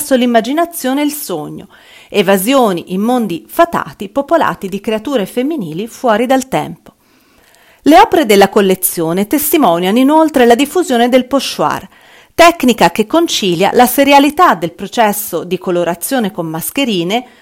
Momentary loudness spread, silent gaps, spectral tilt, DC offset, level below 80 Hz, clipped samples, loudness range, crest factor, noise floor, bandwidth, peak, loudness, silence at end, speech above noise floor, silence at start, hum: 11 LU; none; -4 dB/octave; under 0.1%; -46 dBFS; 1%; 5 LU; 12 dB; -49 dBFS; 19 kHz; 0 dBFS; -12 LUFS; 0.15 s; 38 dB; 0 s; none